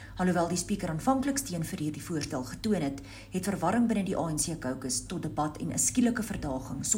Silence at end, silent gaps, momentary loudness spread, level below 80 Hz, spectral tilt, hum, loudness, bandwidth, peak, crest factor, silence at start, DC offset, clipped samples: 0 s; none; 8 LU; -50 dBFS; -4.5 dB/octave; none; -30 LUFS; 16 kHz; -12 dBFS; 18 dB; 0 s; under 0.1%; under 0.1%